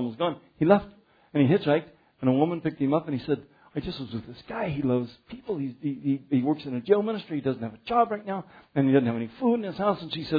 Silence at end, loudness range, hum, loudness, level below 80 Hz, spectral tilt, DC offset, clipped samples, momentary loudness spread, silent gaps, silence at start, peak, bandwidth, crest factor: 0 s; 5 LU; none; -27 LUFS; -58 dBFS; -10 dB/octave; under 0.1%; under 0.1%; 12 LU; none; 0 s; -6 dBFS; 5 kHz; 20 dB